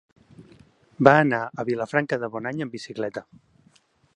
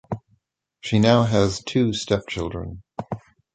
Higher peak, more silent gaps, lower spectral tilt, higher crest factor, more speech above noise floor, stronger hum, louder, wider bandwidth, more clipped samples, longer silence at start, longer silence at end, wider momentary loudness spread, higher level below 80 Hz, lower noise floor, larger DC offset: about the same, 0 dBFS vs -2 dBFS; neither; about the same, -7 dB/octave vs -6 dB/octave; about the same, 24 dB vs 20 dB; second, 38 dB vs 46 dB; neither; about the same, -23 LUFS vs -21 LUFS; first, 10.5 kHz vs 9.2 kHz; neither; first, 0.4 s vs 0.1 s; first, 0.95 s vs 0.35 s; second, 15 LU vs 18 LU; second, -66 dBFS vs -44 dBFS; second, -61 dBFS vs -67 dBFS; neither